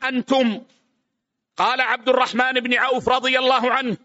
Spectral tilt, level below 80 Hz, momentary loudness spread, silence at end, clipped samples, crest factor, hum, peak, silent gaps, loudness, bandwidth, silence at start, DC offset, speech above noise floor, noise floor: -1 dB/octave; -60 dBFS; 5 LU; 0.1 s; under 0.1%; 16 dB; none; -6 dBFS; none; -19 LUFS; 8 kHz; 0 s; under 0.1%; 59 dB; -78 dBFS